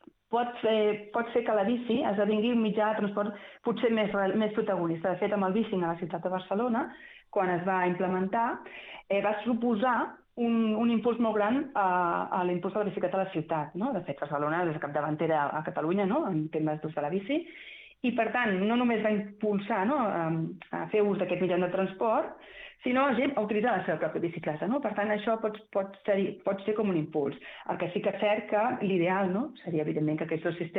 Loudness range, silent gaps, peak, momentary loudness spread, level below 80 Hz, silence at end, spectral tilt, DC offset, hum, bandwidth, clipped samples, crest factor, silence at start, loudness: 2 LU; none; -14 dBFS; 7 LU; -70 dBFS; 0 s; -9.5 dB/octave; under 0.1%; none; 4.1 kHz; under 0.1%; 16 dB; 0.3 s; -29 LUFS